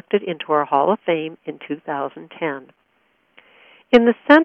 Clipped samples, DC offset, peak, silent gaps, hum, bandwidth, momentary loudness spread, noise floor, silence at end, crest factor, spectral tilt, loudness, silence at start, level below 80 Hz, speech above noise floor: under 0.1%; under 0.1%; 0 dBFS; none; none; 6.6 kHz; 15 LU; -64 dBFS; 0 s; 20 dB; -7 dB/octave; -20 LUFS; 0.15 s; -60 dBFS; 45 dB